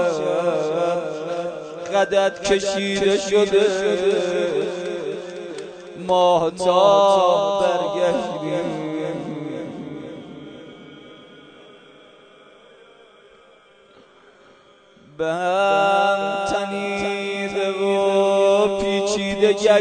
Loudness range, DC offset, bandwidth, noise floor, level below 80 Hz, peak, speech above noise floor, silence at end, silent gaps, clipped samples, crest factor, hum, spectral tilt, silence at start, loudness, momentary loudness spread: 13 LU; under 0.1%; 9.4 kHz; -51 dBFS; -54 dBFS; -4 dBFS; 34 dB; 0 s; none; under 0.1%; 18 dB; none; -4.5 dB/octave; 0 s; -20 LUFS; 16 LU